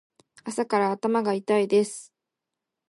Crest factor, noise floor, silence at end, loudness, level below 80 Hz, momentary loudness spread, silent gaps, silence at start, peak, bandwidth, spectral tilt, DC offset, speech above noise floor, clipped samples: 16 dB; -86 dBFS; 0.85 s; -25 LUFS; -80 dBFS; 13 LU; none; 0.45 s; -10 dBFS; 11.5 kHz; -5 dB/octave; under 0.1%; 62 dB; under 0.1%